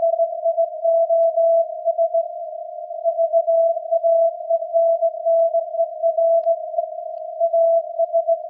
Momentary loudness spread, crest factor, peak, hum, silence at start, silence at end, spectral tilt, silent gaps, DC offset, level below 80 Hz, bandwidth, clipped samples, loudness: 9 LU; 10 dB; -8 dBFS; none; 0 s; 0 s; -5 dB/octave; none; under 0.1%; under -90 dBFS; 0.8 kHz; under 0.1%; -19 LUFS